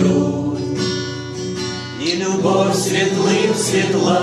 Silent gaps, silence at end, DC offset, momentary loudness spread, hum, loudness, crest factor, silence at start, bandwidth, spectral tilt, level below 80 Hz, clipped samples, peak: none; 0 s; under 0.1%; 8 LU; none; -18 LUFS; 14 dB; 0 s; 14.5 kHz; -4.5 dB/octave; -54 dBFS; under 0.1%; -4 dBFS